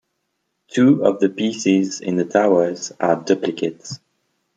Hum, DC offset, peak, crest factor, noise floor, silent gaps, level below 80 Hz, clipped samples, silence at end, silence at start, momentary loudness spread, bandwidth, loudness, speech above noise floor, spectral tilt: none; under 0.1%; -2 dBFS; 18 dB; -73 dBFS; none; -64 dBFS; under 0.1%; 0.6 s; 0.75 s; 11 LU; 9 kHz; -19 LUFS; 55 dB; -5.5 dB/octave